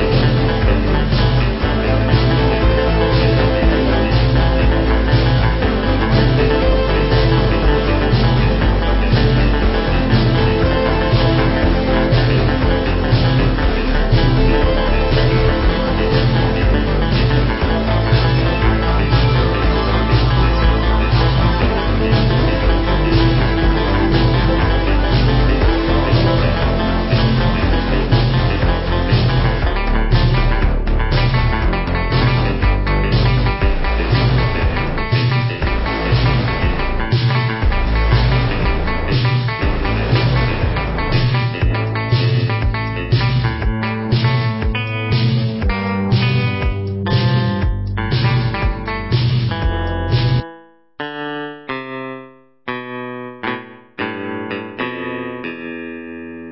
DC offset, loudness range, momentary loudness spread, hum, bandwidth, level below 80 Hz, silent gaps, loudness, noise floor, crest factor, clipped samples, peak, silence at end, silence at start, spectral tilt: under 0.1%; 4 LU; 8 LU; none; 5.8 kHz; -20 dBFS; none; -16 LUFS; -42 dBFS; 14 dB; under 0.1%; -2 dBFS; 0 s; 0 s; -11 dB/octave